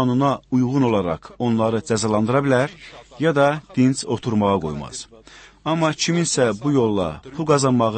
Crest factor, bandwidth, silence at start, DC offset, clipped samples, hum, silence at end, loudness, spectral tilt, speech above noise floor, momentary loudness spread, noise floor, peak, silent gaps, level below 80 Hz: 16 dB; 8.8 kHz; 0 s; under 0.1%; under 0.1%; none; 0 s; -20 LUFS; -5.5 dB/octave; 26 dB; 10 LU; -46 dBFS; -4 dBFS; none; -50 dBFS